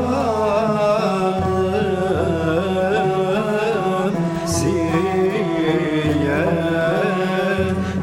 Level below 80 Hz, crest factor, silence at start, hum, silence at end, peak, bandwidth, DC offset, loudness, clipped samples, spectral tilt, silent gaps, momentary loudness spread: -44 dBFS; 12 dB; 0 s; none; 0 s; -6 dBFS; 15.5 kHz; under 0.1%; -19 LUFS; under 0.1%; -6 dB/octave; none; 2 LU